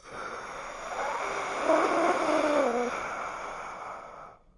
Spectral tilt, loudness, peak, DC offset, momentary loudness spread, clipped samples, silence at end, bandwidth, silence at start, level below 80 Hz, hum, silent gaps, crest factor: -3.5 dB/octave; -29 LUFS; -10 dBFS; under 0.1%; 15 LU; under 0.1%; 0.2 s; 11.5 kHz; 0.05 s; -60 dBFS; none; none; 20 dB